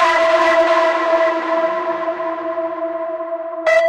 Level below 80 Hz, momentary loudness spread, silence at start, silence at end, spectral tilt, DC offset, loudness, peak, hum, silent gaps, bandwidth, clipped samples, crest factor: -58 dBFS; 10 LU; 0 s; 0 s; -2.5 dB/octave; under 0.1%; -17 LUFS; -2 dBFS; none; none; 9.8 kHz; under 0.1%; 14 dB